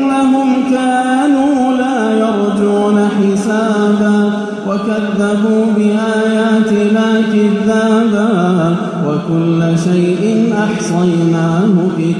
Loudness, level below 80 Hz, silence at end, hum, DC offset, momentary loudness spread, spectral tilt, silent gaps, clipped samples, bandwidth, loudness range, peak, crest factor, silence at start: -12 LUFS; -54 dBFS; 0 s; none; under 0.1%; 3 LU; -7 dB/octave; none; under 0.1%; 10.5 kHz; 1 LU; -2 dBFS; 10 dB; 0 s